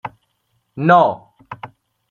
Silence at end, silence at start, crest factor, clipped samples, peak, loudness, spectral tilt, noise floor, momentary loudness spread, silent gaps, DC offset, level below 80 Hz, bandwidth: 0.45 s; 0.05 s; 18 dB; under 0.1%; -2 dBFS; -15 LUFS; -8 dB/octave; -67 dBFS; 25 LU; none; under 0.1%; -64 dBFS; 6.8 kHz